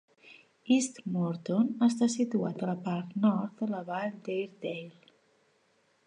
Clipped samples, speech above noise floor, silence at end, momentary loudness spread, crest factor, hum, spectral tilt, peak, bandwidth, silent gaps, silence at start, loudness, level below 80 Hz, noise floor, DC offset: under 0.1%; 40 dB; 1.15 s; 11 LU; 18 dB; none; -6 dB/octave; -14 dBFS; 10.5 kHz; none; 0.25 s; -31 LUFS; -80 dBFS; -70 dBFS; under 0.1%